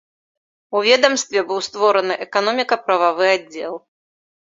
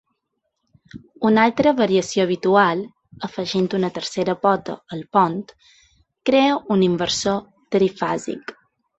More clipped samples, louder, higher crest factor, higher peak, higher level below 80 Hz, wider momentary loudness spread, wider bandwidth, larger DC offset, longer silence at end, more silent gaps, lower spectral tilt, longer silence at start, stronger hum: neither; first, -17 LUFS vs -20 LUFS; about the same, 18 dB vs 18 dB; about the same, 0 dBFS vs -2 dBFS; second, -70 dBFS vs -58 dBFS; about the same, 13 LU vs 15 LU; about the same, 7.8 kHz vs 8.2 kHz; neither; first, 0.8 s vs 0.45 s; neither; second, -1.5 dB/octave vs -5 dB/octave; second, 0.7 s vs 0.95 s; neither